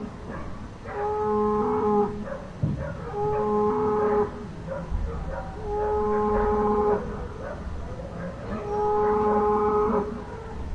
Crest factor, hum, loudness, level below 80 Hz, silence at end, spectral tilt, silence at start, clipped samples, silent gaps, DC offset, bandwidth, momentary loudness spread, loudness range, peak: 14 dB; none; -26 LUFS; -38 dBFS; 0 s; -8.5 dB/octave; 0 s; under 0.1%; none; under 0.1%; 7.8 kHz; 14 LU; 2 LU; -12 dBFS